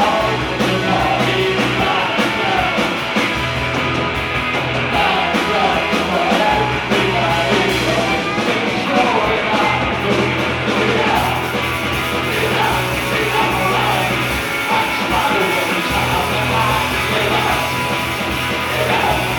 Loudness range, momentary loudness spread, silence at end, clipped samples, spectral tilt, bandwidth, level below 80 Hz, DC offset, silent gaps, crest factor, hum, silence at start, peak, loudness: 1 LU; 3 LU; 0 s; under 0.1%; -4.5 dB/octave; 19 kHz; -36 dBFS; under 0.1%; none; 14 dB; none; 0 s; -2 dBFS; -16 LUFS